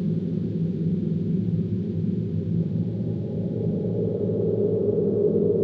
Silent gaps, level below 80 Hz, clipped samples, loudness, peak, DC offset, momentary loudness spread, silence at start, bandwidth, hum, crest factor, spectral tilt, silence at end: none; -54 dBFS; under 0.1%; -25 LUFS; -12 dBFS; under 0.1%; 5 LU; 0 s; 4.5 kHz; none; 12 dB; -12.5 dB/octave; 0 s